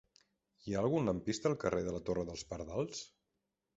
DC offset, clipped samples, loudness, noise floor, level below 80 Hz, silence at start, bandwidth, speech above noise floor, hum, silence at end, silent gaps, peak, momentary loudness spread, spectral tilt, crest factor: under 0.1%; under 0.1%; -37 LUFS; -86 dBFS; -60 dBFS; 0.65 s; 8 kHz; 50 dB; none; 0.7 s; none; -18 dBFS; 11 LU; -6 dB/octave; 20 dB